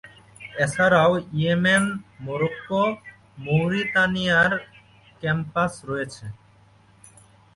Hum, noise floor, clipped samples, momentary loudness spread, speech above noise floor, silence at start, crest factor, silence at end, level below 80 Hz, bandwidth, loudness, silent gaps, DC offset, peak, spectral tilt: none; -55 dBFS; under 0.1%; 16 LU; 33 dB; 0.05 s; 18 dB; 1.2 s; -56 dBFS; 11.5 kHz; -22 LUFS; none; under 0.1%; -6 dBFS; -5.5 dB/octave